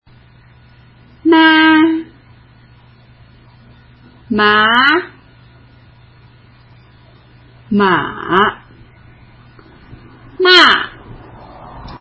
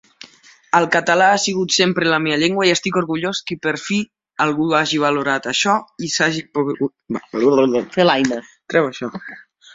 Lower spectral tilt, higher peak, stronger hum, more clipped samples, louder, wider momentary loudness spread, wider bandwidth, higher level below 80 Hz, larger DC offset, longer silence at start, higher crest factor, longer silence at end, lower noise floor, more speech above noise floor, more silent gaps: about the same, -4.5 dB/octave vs -3.5 dB/octave; about the same, 0 dBFS vs -2 dBFS; neither; neither; first, -11 LUFS vs -17 LUFS; first, 19 LU vs 9 LU; about the same, 8 kHz vs 7.8 kHz; first, -46 dBFS vs -60 dBFS; neither; first, 1.25 s vs 0.75 s; about the same, 16 dB vs 18 dB; second, 0.05 s vs 0.35 s; about the same, -44 dBFS vs -47 dBFS; about the same, 32 dB vs 29 dB; neither